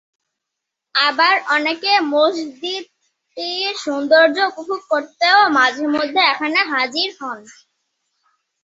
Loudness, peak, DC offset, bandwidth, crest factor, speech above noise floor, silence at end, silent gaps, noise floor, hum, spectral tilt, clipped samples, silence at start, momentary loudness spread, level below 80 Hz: -16 LUFS; -2 dBFS; under 0.1%; 7.8 kHz; 18 dB; 64 dB; 1.1 s; none; -81 dBFS; none; -1.5 dB/octave; under 0.1%; 0.95 s; 13 LU; -70 dBFS